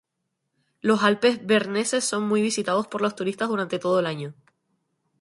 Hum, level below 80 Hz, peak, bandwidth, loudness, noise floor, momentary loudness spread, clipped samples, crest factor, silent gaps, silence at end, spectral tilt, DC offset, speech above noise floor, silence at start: none; -70 dBFS; -4 dBFS; 11.5 kHz; -23 LUFS; -79 dBFS; 8 LU; under 0.1%; 20 dB; none; 0.9 s; -4 dB/octave; under 0.1%; 56 dB; 0.85 s